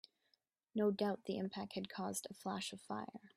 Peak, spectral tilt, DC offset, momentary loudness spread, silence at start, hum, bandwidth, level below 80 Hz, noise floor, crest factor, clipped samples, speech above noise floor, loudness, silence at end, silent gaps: -24 dBFS; -4.5 dB/octave; under 0.1%; 10 LU; 0.75 s; none; 15 kHz; -84 dBFS; -82 dBFS; 18 dB; under 0.1%; 40 dB; -42 LUFS; 0.1 s; none